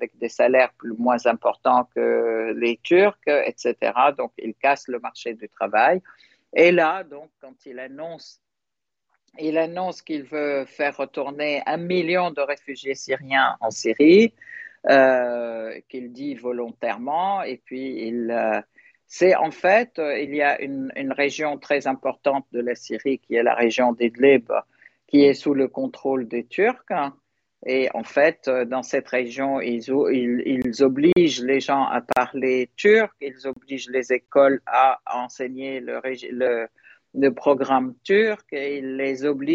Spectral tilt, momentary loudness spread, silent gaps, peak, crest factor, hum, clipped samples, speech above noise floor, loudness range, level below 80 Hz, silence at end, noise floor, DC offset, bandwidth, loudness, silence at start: -5 dB/octave; 14 LU; none; -2 dBFS; 18 dB; none; under 0.1%; 65 dB; 5 LU; -68 dBFS; 0 s; -87 dBFS; under 0.1%; 7.8 kHz; -21 LUFS; 0 s